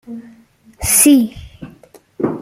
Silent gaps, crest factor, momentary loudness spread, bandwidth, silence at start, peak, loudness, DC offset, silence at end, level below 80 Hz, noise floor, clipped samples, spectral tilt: none; 18 dB; 25 LU; 16.5 kHz; 0.1 s; 0 dBFS; -13 LUFS; under 0.1%; 0 s; -42 dBFS; -45 dBFS; under 0.1%; -3 dB/octave